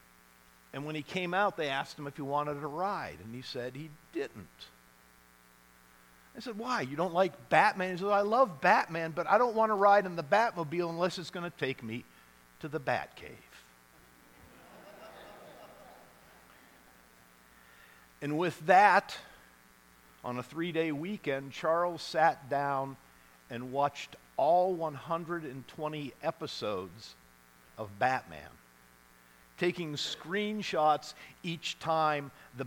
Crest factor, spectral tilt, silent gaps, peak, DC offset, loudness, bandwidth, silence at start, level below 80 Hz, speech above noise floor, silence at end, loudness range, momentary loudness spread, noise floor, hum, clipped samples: 24 dB; -5 dB/octave; none; -8 dBFS; under 0.1%; -31 LUFS; 19 kHz; 0.75 s; -70 dBFS; 30 dB; 0 s; 14 LU; 21 LU; -61 dBFS; none; under 0.1%